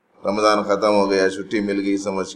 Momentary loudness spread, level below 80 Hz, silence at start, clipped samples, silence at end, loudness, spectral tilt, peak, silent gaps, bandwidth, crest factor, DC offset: 6 LU; -58 dBFS; 0.25 s; under 0.1%; 0 s; -19 LUFS; -4.5 dB/octave; -2 dBFS; none; 11 kHz; 18 dB; under 0.1%